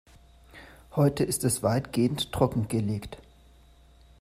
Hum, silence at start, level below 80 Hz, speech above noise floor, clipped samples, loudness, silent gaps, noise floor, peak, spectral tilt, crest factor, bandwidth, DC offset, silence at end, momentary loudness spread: none; 0.55 s; -52 dBFS; 29 dB; under 0.1%; -27 LUFS; none; -56 dBFS; -8 dBFS; -5.5 dB/octave; 22 dB; 15.5 kHz; under 0.1%; 1.05 s; 10 LU